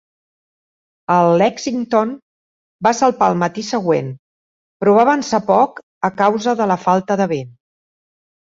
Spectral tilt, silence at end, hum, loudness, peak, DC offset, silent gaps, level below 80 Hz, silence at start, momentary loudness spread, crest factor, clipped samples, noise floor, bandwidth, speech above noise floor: -5.5 dB/octave; 0.95 s; none; -16 LUFS; -2 dBFS; under 0.1%; 2.22-2.79 s, 4.19-4.80 s, 5.83-6.01 s; -60 dBFS; 1.1 s; 10 LU; 16 dB; under 0.1%; under -90 dBFS; 7.8 kHz; over 75 dB